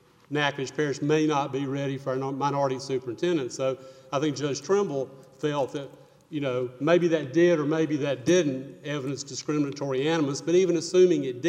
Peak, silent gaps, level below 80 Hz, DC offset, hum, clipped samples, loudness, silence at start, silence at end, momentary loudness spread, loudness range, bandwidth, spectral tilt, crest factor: -8 dBFS; none; -72 dBFS; under 0.1%; none; under 0.1%; -26 LUFS; 0.3 s; 0 s; 10 LU; 4 LU; 10 kHz; -5.5 dB/octave; 18 dB